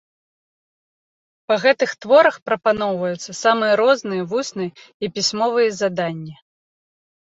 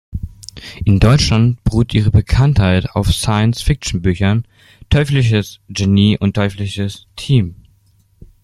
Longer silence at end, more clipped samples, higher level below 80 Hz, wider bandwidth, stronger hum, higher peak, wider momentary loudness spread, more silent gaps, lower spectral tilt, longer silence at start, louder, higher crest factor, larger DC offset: about the same, 0.95 s vs 0.9 s; neither; second, -64 dBFS vs -28 dBFS; second, 8 kHz vs 13 kHz; neither; about the same, -2 dBFS vs 0 dBFS; about the same, 13 LU vs 13 LU; first, 2.42-2.46 s, 4.94-5.00 s vs none; second, -4 dB/octave vs -6 dB/octave; first, 1.5 s vs 0.1 s; second, -19 LUFS vs -15 LUFS; about the same, 18 dB vs 14 dB; neither